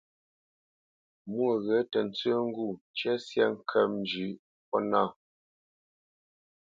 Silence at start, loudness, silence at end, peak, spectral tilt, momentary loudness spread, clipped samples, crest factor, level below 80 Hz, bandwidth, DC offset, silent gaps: 1.25 s; -30 LUFS; 1.65 s; -10 dBFS; -6 dB/octave; 9 LU; under 0.1%; 22 dB; -76 dBFS; 7.6 kHz; under 0.1%; 2.81-2.94 s, 4.39-4.72 s